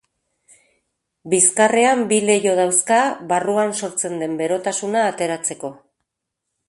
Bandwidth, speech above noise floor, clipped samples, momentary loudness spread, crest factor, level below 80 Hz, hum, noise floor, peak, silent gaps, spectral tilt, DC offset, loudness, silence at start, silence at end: 12 kHz; 62 dB; under 0.1%; 9 LU; 18 dB; -68 dBFS; none; -80 dBFS; -2 dBFS; none; -3 dB/octave; under 0.1%; -18 LUFS; 1.25 s; 0.95 s